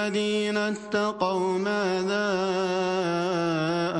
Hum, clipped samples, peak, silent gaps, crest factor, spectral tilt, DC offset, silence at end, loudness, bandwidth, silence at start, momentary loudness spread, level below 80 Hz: none; under 0.1%; -10 dBFS; none; 14 dB; -5 dB/octave; under 0.1%; 0 s; -26 LUFS; 11 kHz; 0 s; 1 LU; -68 dBFS